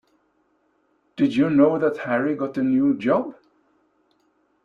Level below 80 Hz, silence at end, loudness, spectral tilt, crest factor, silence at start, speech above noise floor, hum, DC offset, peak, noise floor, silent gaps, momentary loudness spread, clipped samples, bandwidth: -64 dBFS; 1.35 s; -21 LUFS; -8 dB/octave; 18 dB; 1.15 s; 46 dB; 50 Hz at -55 dBFS; under 0.1%; -4 dBFS; -66 dBFS; none; 7 LU; under 0.1%; 6.4 kHz